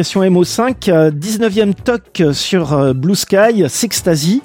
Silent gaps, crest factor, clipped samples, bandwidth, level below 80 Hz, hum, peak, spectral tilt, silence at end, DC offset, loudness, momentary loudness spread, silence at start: none; 12 dB; under 0.1%; 17 kHz; -44 dBFS; none; 0 dBFS; -5 dB/octave; 0.05 s; under 0.1%; -13 LUFS; 4 LU; 0 s